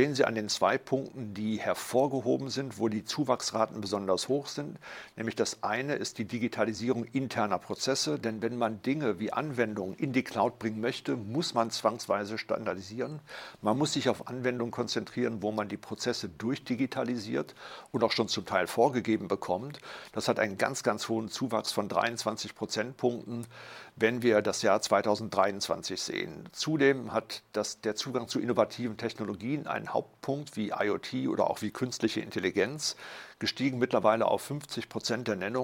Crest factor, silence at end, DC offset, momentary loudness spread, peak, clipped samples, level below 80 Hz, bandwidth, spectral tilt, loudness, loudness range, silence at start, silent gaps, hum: 22 dB; 0 s; under 0.1%; 9 LU; -10 dBFS; under 0.1%; -72 dBFS; 16.5 kHz; -4.5 dB/octave; -31 LUFS; 3 LU; 0 s; none; none